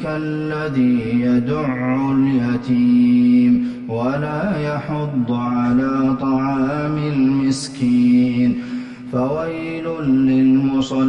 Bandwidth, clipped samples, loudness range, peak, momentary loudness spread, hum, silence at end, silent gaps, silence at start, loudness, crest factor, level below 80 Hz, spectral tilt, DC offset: 10 kHz; under 0.1%; 3 LU; -6 dBFS; 9 LU; none; 0 s; none; 0 s; -18 LUFS; 10 dB; -48 dBFS; -7.5 dB/octave; under 0.1%